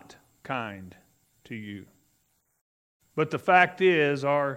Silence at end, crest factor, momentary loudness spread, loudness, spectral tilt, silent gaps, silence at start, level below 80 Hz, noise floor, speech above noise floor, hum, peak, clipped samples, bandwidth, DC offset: 0 s; 22 dB; 21 LU; -24 LUFS; -6 dB/octave; 2.61-3.00 s; 0.45 s; -74 dBFS; -71 dBFS; 46 dB; none; -6 dBFS; under 0.1%; 15.5 kHz; under 0.1%